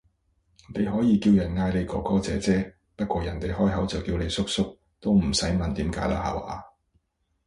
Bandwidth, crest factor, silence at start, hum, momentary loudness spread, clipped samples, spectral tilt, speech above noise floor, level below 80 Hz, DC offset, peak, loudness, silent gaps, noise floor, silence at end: 11.5 kHz; 16 dB; 0.7 s; none; 11 LU; under 0.1%; -6 dB/octave; 46 dB; -40 dBFS; under 0.1%; -10 dBFS; -26 LUFS; none; -71 dBFS; 0.8 s